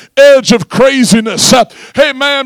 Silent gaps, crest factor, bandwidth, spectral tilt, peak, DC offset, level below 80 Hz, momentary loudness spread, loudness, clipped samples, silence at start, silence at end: none; 8 dB; 19.5 kHz; -3.5 dB/octave; 0 dBFS; under 0.1%; -42 dBFS; 6 LU; -8 LUFS; 7%; 0.15 s; 0 s